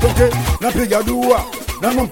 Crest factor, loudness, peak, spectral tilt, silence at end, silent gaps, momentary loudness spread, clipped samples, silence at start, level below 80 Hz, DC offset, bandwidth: 16 dB; -17 LUFS; 0 dBFS; -5.5 dB/octave; 0 s; none; 4 LU; under 0.1%; 0 s; -26 dBFS; under 0.1%; 17 kHz